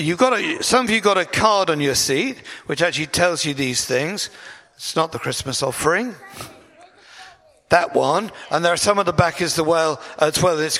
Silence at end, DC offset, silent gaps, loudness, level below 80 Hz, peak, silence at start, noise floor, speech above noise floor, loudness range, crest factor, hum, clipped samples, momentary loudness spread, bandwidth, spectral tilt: 0 s; under 0.1%; none; -19 LUFS; -50 dBFS; 0 dBFS; 0 s; -48 dBFS; 29 dB; 5 LU; 20 dB; none; under 0.1%; 11 LU; 16 kHz; -3.5 dB/octave